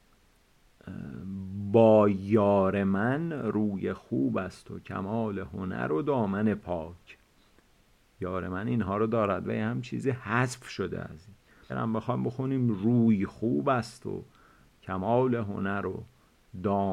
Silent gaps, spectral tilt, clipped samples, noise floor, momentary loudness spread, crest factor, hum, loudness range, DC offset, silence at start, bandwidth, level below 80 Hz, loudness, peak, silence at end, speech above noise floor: none; -8 dB/octave; under 0.1%; -63 dBFS; 15 LU; 22 dB; none; 7 LU; under 0.1%; 0.85 s; 11.5 kHz; -60 dBFS; -29 LUFS; -8 dBFS; 0 s; 36 dB